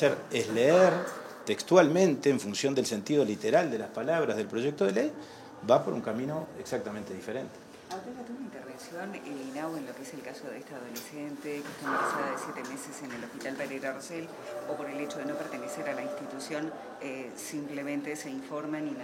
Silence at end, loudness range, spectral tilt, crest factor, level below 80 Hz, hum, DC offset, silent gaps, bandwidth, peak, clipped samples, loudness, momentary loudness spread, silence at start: 0 s; 13 LU; -5 dB/octave; 24 dB; -76 dBFS; none; under 0.1%; none; 16.5 kHz; -8 dBFS; under 0.1%; -31 LUFS; 16 LU; 0 s